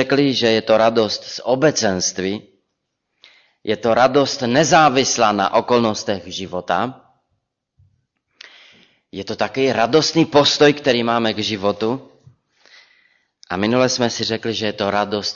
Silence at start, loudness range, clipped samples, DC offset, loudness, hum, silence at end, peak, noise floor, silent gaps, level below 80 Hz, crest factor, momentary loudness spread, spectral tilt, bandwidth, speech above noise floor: 0 s; 8 LU; under 0.1%; under 0.1%; -17 LUFS; none; 0 s; -2 dBFS; -75 dBFS; none; -58 dBFS; 16 dB; 12 LU; -4 dB/octave; 7.6 kHz; 58 dB